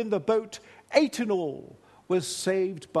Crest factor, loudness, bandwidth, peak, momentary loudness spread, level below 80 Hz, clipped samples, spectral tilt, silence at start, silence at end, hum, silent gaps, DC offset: 22 dB; -27 LUFS; 12.5 kHz; -6 dBFS; 15 LU; -72 dBFS; under 0.1%; -4.5 dB/octave; 0 s; 0 s; none; none; under 0.1%